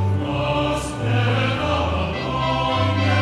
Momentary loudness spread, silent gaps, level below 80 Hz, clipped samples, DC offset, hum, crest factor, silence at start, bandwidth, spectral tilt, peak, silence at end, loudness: 4 LU; none; -36 dBFS; under 0.1%; under 0.1%; none; 14 dB; 0 s; 12 kHz; -6 dB/octave; -6 dBFS; 0 s; -21 LUFS